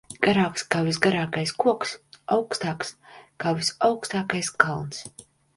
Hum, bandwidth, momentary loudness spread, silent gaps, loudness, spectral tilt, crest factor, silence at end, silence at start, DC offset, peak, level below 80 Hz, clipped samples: none; 11.5 kHz; 12 LU; none; -25 LUFS; -4.5 dB/octave; 26 dB; 0.35 s; 0.1 s; under 0.1%; 0 dBFS; -60 dBFS; under 0.1%